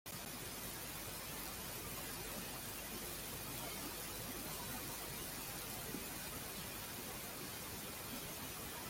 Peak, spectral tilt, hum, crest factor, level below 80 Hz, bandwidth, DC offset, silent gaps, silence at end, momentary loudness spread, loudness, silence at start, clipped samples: -26 dBFS; -2.5 dB/octave; none; 22 dB; -62 dBFS; 17 kHz; under 0.1%; none; 0 s; 2 LU; -45 LUFS; 0.05 s; under 0.1%